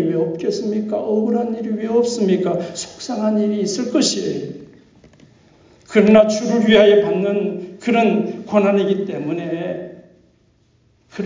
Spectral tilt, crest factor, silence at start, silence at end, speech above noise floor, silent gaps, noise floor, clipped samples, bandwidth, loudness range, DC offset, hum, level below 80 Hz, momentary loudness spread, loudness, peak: -5.5 dB/octave; 16 dB; 0 s; 0 s; 41 dB; none; -57 dBFS; under 0.1%; 7.6 kHz; 6 LU; under 0.1%; none; -58 dBFS; 14 LU; -18 LUFS; -2 dBFS